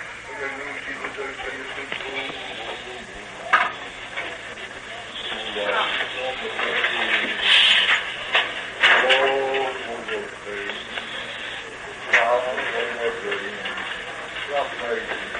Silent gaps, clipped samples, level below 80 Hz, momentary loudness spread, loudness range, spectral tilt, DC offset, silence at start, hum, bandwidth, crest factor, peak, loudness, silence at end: none; under 0.1%; -56 dBFS; 16 LU; 9 LU; -1.5 dB/octave; under 0.1%; 0 s; none; 10.5 kHz; 20 dB; -4 dBFS; -22 LUFS; 0 s